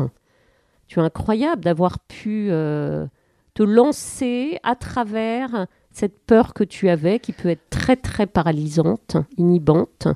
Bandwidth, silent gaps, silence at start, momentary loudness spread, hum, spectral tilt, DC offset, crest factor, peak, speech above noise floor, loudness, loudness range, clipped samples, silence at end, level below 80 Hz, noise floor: 13.5 kHz; none; 0 s; 10 LU; none; -7 dB/octave; under 0.1%; 20 dB; 0 dBFS; 41 dB; -20 LUFS; 2 LU; under 0.1%; 0 s; -44 dBFS; -60 dBFS